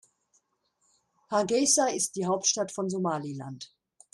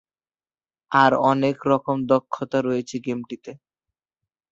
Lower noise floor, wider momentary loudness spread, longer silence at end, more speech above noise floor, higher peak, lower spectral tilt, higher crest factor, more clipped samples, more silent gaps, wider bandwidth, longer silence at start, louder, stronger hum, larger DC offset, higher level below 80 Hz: second, -74 dBFS vs under -90 dBFS; about the same, 17 LU vs 15 LU; second, 0.45 s vs 0.95 s; second, 46 dB vs over 69 dB; second, -10 dBFS vs -2 dBFS; second, -3 dB/octave vs -6.5 dB/octave; about the same, 20 dB vs 20 dB; neither; neither; first, 13 kHz vs 7.8 kHz; first, 1.3 s vs 0.9 s; second, -27 LUFS vs -21 LUFS; neither; neither; second, -72 dBFS vs -66 dBFS